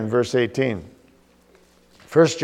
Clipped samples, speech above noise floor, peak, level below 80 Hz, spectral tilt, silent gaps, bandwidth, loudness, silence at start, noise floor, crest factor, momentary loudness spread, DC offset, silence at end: under 0.1%; 36 dB; -4 dBFS; -58 dBFS; -5.5 dB/octave; none; 13 kHz; -21 LUFS; 0 s; -55 dBFS; 18 dB; 7 LU; under 0.1%; 0 s